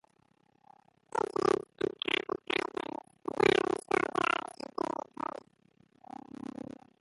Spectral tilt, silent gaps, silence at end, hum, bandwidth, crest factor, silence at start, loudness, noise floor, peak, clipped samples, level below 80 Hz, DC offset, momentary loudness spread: -4 dB/octave; none; 2.75 s; none; 11.5 kHz; 24 dB; 1.15 s; -33 LUFS; -70 dBFS; -10 dBFS; under 0.1%; -68 dBFS; under 0.1%; 17 LU